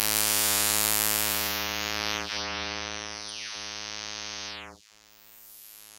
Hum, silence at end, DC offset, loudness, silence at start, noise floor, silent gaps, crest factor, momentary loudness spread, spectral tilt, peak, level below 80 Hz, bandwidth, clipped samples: none; 0 s; under 0.1%; -27 LUFS; 0 s; -56 dBFS; none; 30 dB; 19 LU; -0.5 dB/octave; 0 dBFS; -52 dBFS; 16 kHz; under 0.1%